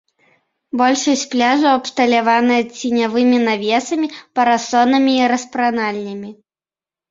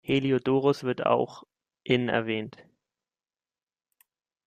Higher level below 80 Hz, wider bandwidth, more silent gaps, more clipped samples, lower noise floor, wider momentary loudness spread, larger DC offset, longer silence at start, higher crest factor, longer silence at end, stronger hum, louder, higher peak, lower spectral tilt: about the same, -62 dBFS vs -66 dBFS; second, 7.8 kHz vs 14.5 kHz; neither; neither; about the same, under -90 dBFS vs under -90 dBFS; about the same, 8 LU vs 10 LU; neither; first, 0.75 s vs 0.1 s; about the same, 16 dB vs 20 dB; second, 0.8 s vs 1.85 s; neither; first, -16 LUFS vs -27 LUFS; first, -2 dBFS vs -8 dBFS; second, -3 dB/octave vs -7 dB/octave